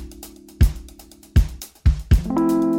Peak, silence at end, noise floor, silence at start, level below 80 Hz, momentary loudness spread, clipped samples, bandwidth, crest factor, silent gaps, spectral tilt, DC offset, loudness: -4 dBFS; 0 s; -44 dBFS; 0 s; -22 dBFS; 20 LU; under 0.1%; 17 kHz; 16 dB; none; -7.5 dB/octave; under 0.1%; -21 LUFS